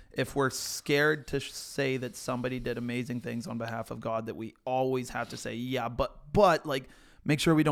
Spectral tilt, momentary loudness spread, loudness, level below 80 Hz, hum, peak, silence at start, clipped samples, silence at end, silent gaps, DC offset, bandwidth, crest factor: -5 dB/octave; 12 LU; -31 LUFS; -52 dBFS; none; -10 dBFS; 0 s; under 0.1%; 0 s; none; under 0.1%; 18 kHz; 20 dB